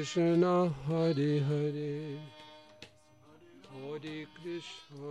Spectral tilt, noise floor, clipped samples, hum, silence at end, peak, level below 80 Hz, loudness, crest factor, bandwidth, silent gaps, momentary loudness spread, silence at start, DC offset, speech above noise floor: -7 dB/octave; -61 dBFS; under 0.1%; none; 0 s; -18 dBFS; -68 dBFS; -32 LUFS; 16 dB; 10 kHz; none; 25 LU; 0 s; under 0.1%; 29 dB